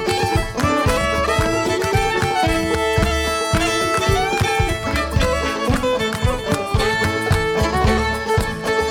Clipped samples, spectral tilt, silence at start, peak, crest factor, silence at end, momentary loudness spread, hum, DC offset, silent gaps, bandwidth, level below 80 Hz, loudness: under 0.1%; -4.5 dB/octave; 0 s; -4 dBFS; 14 dB; 0 s; 3 LU; none; under 0.1%; none; 18 kHz; -28 dBFS; -18 LUFS